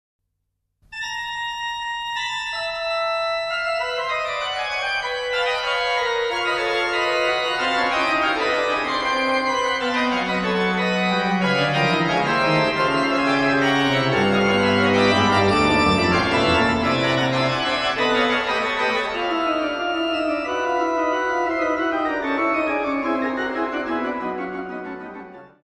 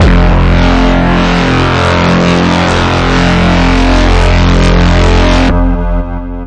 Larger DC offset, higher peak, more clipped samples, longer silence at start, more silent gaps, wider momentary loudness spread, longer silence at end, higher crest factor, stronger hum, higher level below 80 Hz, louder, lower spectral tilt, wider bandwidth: neither; second, -6 dBFS vs 0 dBFS; neither; first, 0.9 s vs 0 s; neither; first, 8 LU vs 2 LU; first, 0.2 s vs 0 s; first, 16 dB vs 8 dB; neither; second, -48 dBFS vs -12 dBFS; second, -20 LUFS vs -9 LUFS; about the same, -5 dB/octave vs -6 dB/octave; first, 12.5 kHz vs 9.2 kHz